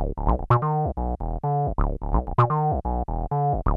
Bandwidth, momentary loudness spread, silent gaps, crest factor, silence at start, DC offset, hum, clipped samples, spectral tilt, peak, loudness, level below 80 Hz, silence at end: 4.3 kHz; 7 LU; none; 18 dB; 0 s; under 0.1%; none; under 0.1%; -11 dB/octave; -4 dBFS; -25 LUFS; -28 dBFS; 0 s